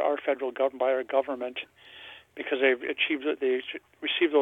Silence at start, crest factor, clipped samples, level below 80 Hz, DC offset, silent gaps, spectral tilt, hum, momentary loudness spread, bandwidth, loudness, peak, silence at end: 0 s; 18 dB; under 0.1%; -76 dBFS; under 0.1%; none; -4.5 dB/octave; none; 19 LU; 4 kHz; -28 LUFS; -10 dBFS; 0 s